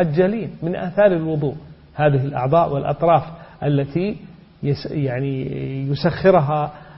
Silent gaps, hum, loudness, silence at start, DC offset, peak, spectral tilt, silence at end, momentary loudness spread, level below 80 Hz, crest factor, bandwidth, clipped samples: none; none; -20 LUFS; 0 s; under 0.1%; -2 dBFS; -12 dB/octave; 0 s; 10 LU; -48 dBFS; 16 dB; 5.8 kHz; under 0.1%